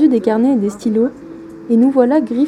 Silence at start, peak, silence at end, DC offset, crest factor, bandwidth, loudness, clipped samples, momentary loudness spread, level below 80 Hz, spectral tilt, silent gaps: 0 s; 0 dBFS; 0 s; under 0.1%; 14 dB; 10.5 kHz; -14 LUFS; under 0.1%; 21 LU; -56 dBFS; -7.5 dB/octave; none